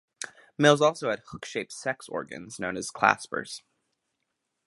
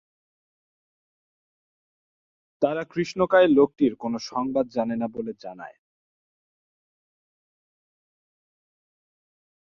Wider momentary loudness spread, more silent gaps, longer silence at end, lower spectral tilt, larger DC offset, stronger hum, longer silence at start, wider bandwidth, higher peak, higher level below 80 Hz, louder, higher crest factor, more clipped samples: about the same, 18 LU vs 19 LU; neither; second, 1.1 s vs 3.95 s; second, -4 dB/octave vs -6 dB/octave; neither; neither; second, 0.2 s vs 2.6 s; first, 11.5 kHz vs 7.4 kHz; first, -2 dBFS vs -6 dBFS; about the same, -68 dBFS vs -66 dBFS; second, -27 LUFS vs -23 LUFS; about the same, 26 dB vs 22 dB; neither